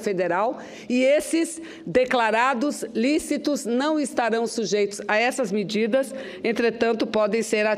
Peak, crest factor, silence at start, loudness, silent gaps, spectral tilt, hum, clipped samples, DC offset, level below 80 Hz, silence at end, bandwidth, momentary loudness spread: -6 dBFS; 16 dB; 0 s; -23 LUFS; none; -4 dB/octave; none; under 0.1%; under 0.1%; -62 dBFS; 0 s; 15.5 kHz; 6 LU